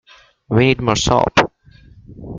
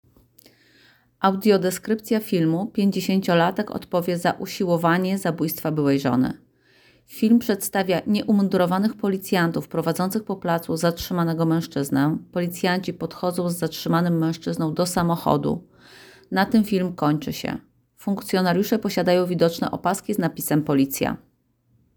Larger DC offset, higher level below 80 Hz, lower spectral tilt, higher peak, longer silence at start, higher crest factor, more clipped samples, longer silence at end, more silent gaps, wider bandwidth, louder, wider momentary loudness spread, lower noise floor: neither; first, -38 dBFS vs -56 dBFS; about the same, -5 dB/octave vs -6 dB/octave; first, 0 dBFS vs -4 dBFS; second, 0.5 s vs 1.2 s; about the same, 18 dB vs 18 dB; neither; second, 0 s vs 0.8 s; neither; second, 9.4 kHz vs over 20 kHz; first, -16 LUFS vs -23 LUFS; about the same, 5 LU vs 7 LU; second, -46 dBFS vs -64 dBFS